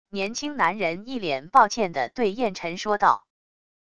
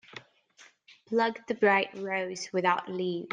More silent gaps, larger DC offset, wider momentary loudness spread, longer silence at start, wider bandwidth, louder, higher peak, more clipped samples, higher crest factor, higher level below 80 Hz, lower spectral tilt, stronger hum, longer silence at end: neither; first, 0.5% vs under 0.1%; about the same, 9 LU vs 8 LU; about the same, 0.05 s vs 0.15 s; first, 11 kHz vs 9.6 kHz; first, -24 LUFS vs -29 LUFS; first, -4 dBFS vs -10 dBFS; neither; about the same, 22 dB vs 20 dB; first, -60 dBFS vs -78 dBFS; about the same, -4 dB/octave vs -4.5 dB/octave; neither; first, 0.65 s vs 0.05 s